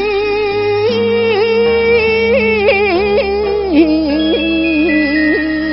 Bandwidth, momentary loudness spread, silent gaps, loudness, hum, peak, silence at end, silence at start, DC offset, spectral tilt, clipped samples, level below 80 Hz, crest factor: 5.8 kHz; 4 LU; none; -12 LUFS; none; 0 dBFS; 0 s; 0 s; 0.4%; -3 dB/octave; under 0.1%; -34 dBFS; 12 dB